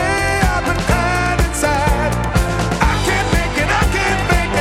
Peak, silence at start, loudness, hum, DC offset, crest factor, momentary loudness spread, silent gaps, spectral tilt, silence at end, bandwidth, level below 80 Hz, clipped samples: 0 dBFS; 0 s; -16 LUFS; none; under 0.1%; 16 dB; 2 LU; none; -4.5 dB/octave; 0 s; 16 kHz; -22 dBFS; under 0.1%